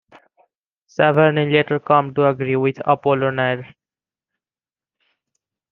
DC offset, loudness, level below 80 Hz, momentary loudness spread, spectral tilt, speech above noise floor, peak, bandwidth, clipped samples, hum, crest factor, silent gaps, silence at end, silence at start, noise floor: under 0.1%; -18 LUFS; -64 dBFS; 7 LU; -8 dB/octave; over 73 dB; -2 dBFS; 6.6 kHz; under 0.1%; none; 18 dB; none; 2.05 s; 1 s; under -90 dBFS